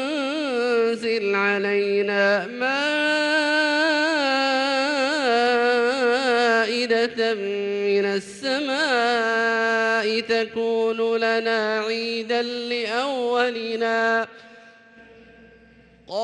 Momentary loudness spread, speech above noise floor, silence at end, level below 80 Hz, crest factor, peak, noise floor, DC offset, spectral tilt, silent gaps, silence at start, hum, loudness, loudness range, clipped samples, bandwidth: 5 LU; 30 dB; 0 s; -70 dBFS; 14 dB; -8 dBFS; -52 dBFS; under 0.1%; -3.5 dB/octave; none; 0 s; none; -21 LUFS; 4 LU; under 0.1%; 11 kHz